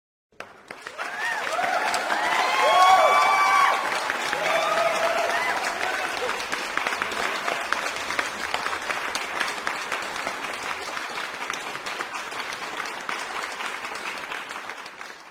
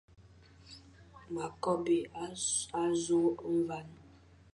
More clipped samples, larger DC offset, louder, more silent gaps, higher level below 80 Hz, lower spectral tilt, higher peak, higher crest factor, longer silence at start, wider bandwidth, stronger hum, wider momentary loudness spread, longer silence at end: neither; neither; first, -24 LUFS vs -33 LUFS; neither; about the same, -64 dBFS vs -66 dBFS; second, -1 dB/octave vs -4 dB/octave; first, -4 dBFS vs -18 dBFS; first, 22 dB vs 16 dB; first, 0.4 s vs 0.2 s; first, 16.5 kHz vs 11.5 kHz; neither; second, 14 LU vs 23 LU; second, 0 s vs 0.5 s